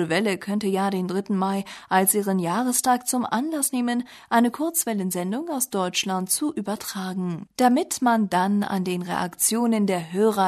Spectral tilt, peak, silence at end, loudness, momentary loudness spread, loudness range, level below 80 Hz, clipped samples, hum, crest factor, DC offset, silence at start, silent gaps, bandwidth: -4 dB/octave; -6 dBFS; 0 s; -23 LUFS; 8 LU; 2 LU; -68 dBFS; under 0.1%; none; 18 dB; under 0.1%; 0 s; none; 13.5 kHz